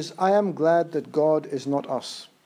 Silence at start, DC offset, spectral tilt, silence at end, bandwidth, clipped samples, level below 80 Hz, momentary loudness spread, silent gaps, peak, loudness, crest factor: 0 s; under 0.1%; -6 dB/octave; 0.2 s; 14.5 kHz; under 0.1%; -80 dBFS; 9 LU; none; -8 dBFS; -24 LUFS; 16 dB